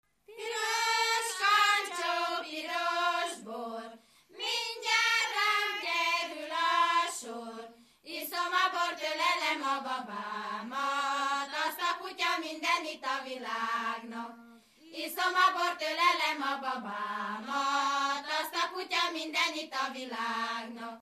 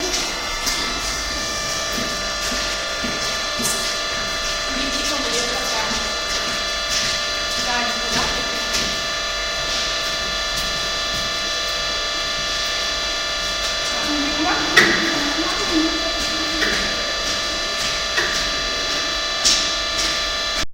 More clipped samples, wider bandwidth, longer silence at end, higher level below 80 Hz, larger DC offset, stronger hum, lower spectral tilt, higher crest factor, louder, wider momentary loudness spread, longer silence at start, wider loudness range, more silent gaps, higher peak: neither; about the same, 15 kHz vs 16 kHz; about the same, 0 s vs 0 s; second, -84 dBFS vs -38 dBFS; second, under 0.1% vs 0.2%; neither; about the same, -0.5 dB/octave vs -1 dB/octave; about the same, 18 dB vs 22 dB; second, -31 LUFS vs -19 LUFS; first, 13 LU vs 4 LU; first, 0.3 s vs 0 s; about the same, 4 LU vs 3 LU; neither; second, -14 dBFS vs 0 dBFS